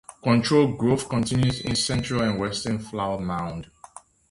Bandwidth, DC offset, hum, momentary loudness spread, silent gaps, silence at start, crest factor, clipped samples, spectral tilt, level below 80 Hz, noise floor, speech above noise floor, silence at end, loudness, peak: 11.5 kHz; under 0.1%; none; 10 LU; none; 0.25 s; 18 dB; under 0.1%; -5.5 dB/octave; -48 dBFS; -48 dBFS; 25 dB; 0.65 s; -24 LUFS; -6 dBFS